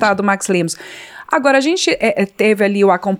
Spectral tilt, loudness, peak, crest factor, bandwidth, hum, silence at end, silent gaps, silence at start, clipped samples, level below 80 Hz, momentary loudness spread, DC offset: -4.5 dB/octave; -15 LUFS; -2 dBFS; 14 dB; 16 kHz; none; 0 s; none; 0 s; under 0.1%; -58 dBFS; 11 LU; under 0.1%